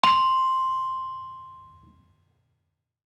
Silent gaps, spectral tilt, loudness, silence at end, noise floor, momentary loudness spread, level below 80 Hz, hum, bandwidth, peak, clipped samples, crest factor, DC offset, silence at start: none; -2.5 dB/octave; -24 LUFS; 1.45 s; -77 dBFS; 22 LU; -70 dBFS; none; 12 kHz; -2 dBFS; under 0.1%; 24 dB; under 0.1%; 0.05 s